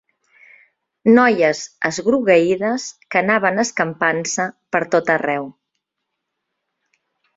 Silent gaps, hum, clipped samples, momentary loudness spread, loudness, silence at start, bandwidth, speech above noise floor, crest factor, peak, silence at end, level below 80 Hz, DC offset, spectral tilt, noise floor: none; none; under 0.1%; 9 LU; -17 LUFS; 1.05 s; 7.8 kHz; 61 dB; 18 dB; -2 dBFS; 1.85 s; -64 dBFS; under 0.1%; -4.5 dB/octave; -78 dBFS